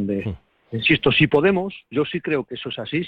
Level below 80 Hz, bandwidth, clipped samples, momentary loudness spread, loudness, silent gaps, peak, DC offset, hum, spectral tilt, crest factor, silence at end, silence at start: -48 dBFS; 5.6 kHz; under 0.1%; 15 LU; -20 LUFS; none; -4 dBFS; under 0.1%; none; -8 dB/octave; 16 dB; 0 s; 0 s